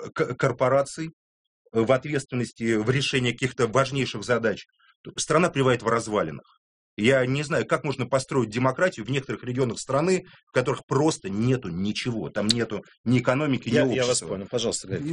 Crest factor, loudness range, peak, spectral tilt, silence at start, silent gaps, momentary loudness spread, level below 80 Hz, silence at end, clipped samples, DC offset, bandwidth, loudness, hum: 24 dB; 1 LU; -2 dBFS; -5 dB/octave; 0 s; 1.13-1.65 s, 4.96-5.04 s, 6.57-6.97 s, 10.43-10.47 s, 10.83-10.88 s, 12.98-13.04 s; 8 LU; -58 dBFS; 0 s; under 0.1%; under 0.1%; 10.5 kHz; -25 LUFS; none